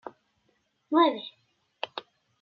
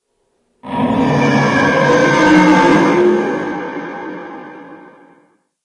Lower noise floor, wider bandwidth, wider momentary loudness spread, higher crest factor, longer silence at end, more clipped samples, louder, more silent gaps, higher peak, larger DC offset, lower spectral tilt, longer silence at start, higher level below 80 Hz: first, -73 dBFS vs -64 dBFS; second, 5.8 kHz vs 10.5 kHz; first, 21 LU vs 18 LU; first, 22 dB vs 14 dB; second, 0.4 s vs 0.9 s; neither; second, -27 LUFS vs -12 LUFS; neither; second, -10 dBFS vs 0 dBFS; neither; about the same, -5.5 dB/octave vs -6 dB/octave; second, 0.05 s vs 0.65 s; second, -88 dBFS vs -48 dBFS